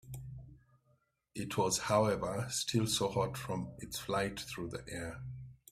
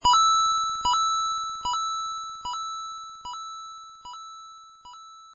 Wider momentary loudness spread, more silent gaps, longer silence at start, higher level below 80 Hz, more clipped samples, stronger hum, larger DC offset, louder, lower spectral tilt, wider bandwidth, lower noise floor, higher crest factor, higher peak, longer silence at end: second, 17 LU vs 24 LU; neither; about the same, 0.05 s vs 0 s; second, -60 dBFS vs -54 dBFS; neither; neither; neither; second, -35 LUFS vs -25 LUFS; first, -4 dB/octave vs 0.5 dB/octave; first, 15.5 kHz vs 7.4 kHz; first, -74 dBFS vs -47 dBFS; first, 22 dB vs 16 dB; second, -16 dBFS vs -12 dBFS; first, 0.15 s vs 0 s